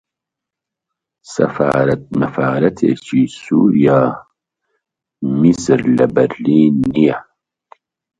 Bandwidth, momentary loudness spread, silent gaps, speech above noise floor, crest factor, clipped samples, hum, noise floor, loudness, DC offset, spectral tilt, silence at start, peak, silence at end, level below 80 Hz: 9.2 kHz; 7 LU; none; 70 dB; 16 dB; under 0.1%; none; -83 dBFS; -14 LUFS; under 0.1%; -7.5 dB/octave; 1.3 s; 0 dBFS; 1 s; -50 dBFS